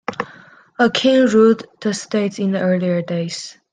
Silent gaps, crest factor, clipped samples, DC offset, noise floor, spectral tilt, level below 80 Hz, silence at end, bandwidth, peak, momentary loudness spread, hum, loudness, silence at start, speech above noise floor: none; 16 dB; under 0.1%; under 0.1%; -45 dBFS; -5.5 dB/octave; -64 dBFS; 0.2 s; 9.8 kHz; -2 dBFS; 16 LU; none; -17 LUFS; 0.1 s; 28 dB